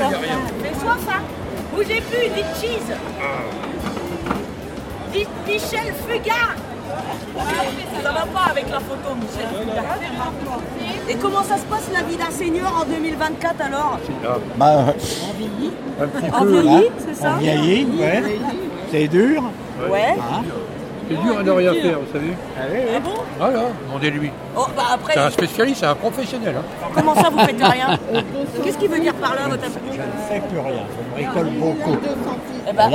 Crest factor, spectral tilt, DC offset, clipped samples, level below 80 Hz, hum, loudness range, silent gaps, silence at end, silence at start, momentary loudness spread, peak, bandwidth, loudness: 18 dB; -5 dB/octave; under 0.1%; under 0.1%; -44 dBFS; none; 6 LU; none; 0 s; 0 s; 11 LU; 0 dBFS; 16.5 kHz; -20 LUFS